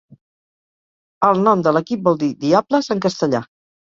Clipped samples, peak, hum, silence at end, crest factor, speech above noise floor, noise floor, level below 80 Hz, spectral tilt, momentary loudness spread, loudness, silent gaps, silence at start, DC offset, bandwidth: under 0.1%; -2 dBFS; none; 0.4 s; 18 dB; over 73 dB; under -90 dBFS; -60 dBFS; -6.5 dB/octave; 6 LU; -17 LUFS; none; 1.2 s; under 0.1%; 7.6 kHz